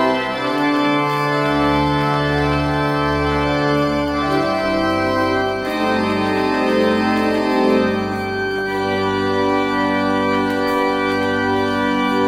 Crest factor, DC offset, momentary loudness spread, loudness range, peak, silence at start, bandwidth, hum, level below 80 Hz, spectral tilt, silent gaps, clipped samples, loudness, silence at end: 14 dB; under 0.1%; 3 LU; 1 LU; -4 dBFS; 0 s; 16 kHz; none; -38 dBFS; -6 dB/octave; none; under 0.1%; -18 LUFS; 0 s